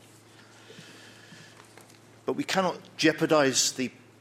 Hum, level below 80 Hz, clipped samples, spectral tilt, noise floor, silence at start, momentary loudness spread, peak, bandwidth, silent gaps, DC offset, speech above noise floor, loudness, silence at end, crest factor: none; -72 dBFS; under 0.1%; -3 dB/octave; -54 dBFS; 0.75 s; 26 LU; -10 dBFS; 16 kHz; none; under 0.1%; 28 dB; -26 LUFS; 0.3 s; 20 dB